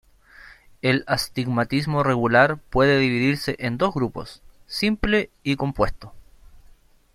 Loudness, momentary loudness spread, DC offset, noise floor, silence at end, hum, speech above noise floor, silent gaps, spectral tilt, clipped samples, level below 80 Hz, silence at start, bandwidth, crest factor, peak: -22 LUFS; 9 LU; under 0.1%; -52 dBFS; 0.6 s; none; 30 dB; none; -6 dB/octave; under 0.1%; -40 dBFS; 0.45 s; 14 kHz; 20 dB; -2 dBFS